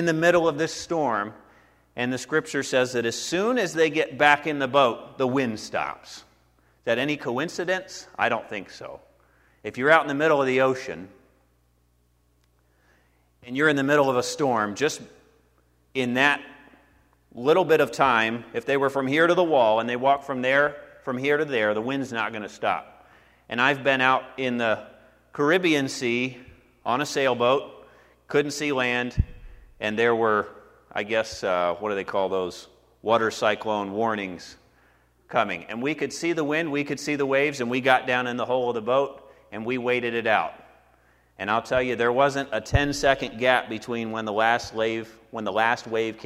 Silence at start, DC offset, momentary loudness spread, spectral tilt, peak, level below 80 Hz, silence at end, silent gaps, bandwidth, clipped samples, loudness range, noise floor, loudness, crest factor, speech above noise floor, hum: 0 s; under 0.1%; 13 LU; -4.5 dB/octave; -2 dBFS; -48 dBFS; 0 s; none; 15.5 kHz; under 0.1%; 5 LU; -65 dBFS; -24 LUFS; 22 dB; 41 dB; none